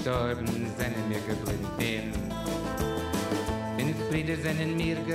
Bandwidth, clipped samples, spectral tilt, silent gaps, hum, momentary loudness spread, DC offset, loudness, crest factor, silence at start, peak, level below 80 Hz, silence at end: 16 kHz; under 0.1%; -5.5 dB/octave; none; none; 3 LU; under 0.1%; -31 LUFS; 16 dB; 0 s; -14 dBFS; -44 dBFS; 0 s